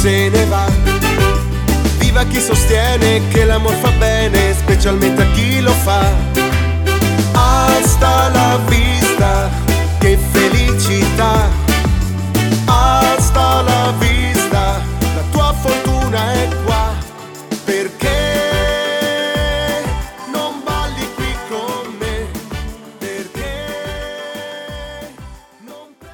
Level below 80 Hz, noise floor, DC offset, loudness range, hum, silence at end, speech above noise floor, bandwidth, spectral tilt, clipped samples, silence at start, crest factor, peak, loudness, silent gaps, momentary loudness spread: -20 dBFS; -38 dBFS; under 0.1%; 11 LU; none; 0 s; 26 dB; 19.5 kHz; -5 dB/octave; under 0.1%; 0 s; 14 dB; 0 dBFS; -14 LUFS; none; 13 LU